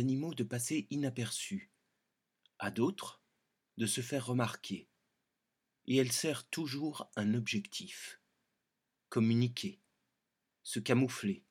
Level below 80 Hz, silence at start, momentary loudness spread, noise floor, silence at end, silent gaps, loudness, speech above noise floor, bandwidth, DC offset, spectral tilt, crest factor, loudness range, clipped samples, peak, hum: -86 dBFS; 0 s; 14 LU; -86 dBFS; 0.1 s; none; -36 LUFS; 51 dB; 17 kHz; under 0.1%; -4.5 dB/octave; 24 dB; 3 LU; under 0.1%; -14 dBFS; none